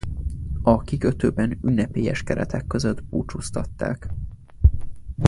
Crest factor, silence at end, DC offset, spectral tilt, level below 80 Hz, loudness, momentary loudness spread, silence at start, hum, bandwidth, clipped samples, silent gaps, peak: 22 dB; 0 s; under 0.1%; -7.5 dB/octave; -30 dBFS; -24 LUFS; 11 LU; 0.05 s; none; 11.5 kHz; under 0.1%; none; 0 dBFS